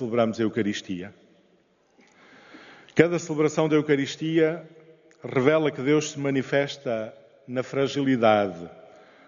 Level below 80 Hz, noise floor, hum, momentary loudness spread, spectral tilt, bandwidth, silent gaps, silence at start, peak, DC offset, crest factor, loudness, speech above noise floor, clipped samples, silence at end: -68 dBFS; -63 dBFS; none; 14 LU; -5 dB/octave; 7.4 kHz; none; 0 s; -2 dBFS; under 0.1%; 24 dB; -24 LUFS; 39 dB; under 0.1%; 0.45 s